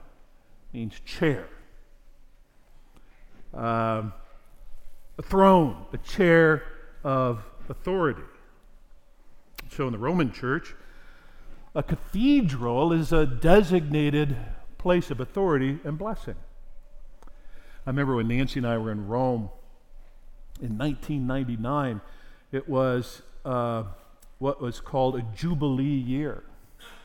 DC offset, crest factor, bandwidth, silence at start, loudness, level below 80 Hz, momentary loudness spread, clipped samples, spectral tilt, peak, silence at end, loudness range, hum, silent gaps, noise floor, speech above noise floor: under 0.1%; 22 dB; 16 kHz; 0 s; -26 LUFS; -40 dBFS; 19 LU; under 0.1%; -7.5 dB/octave; -4 dBFS; 0.05 s; 9 LU; none; none; -53 dBFS; 28 dB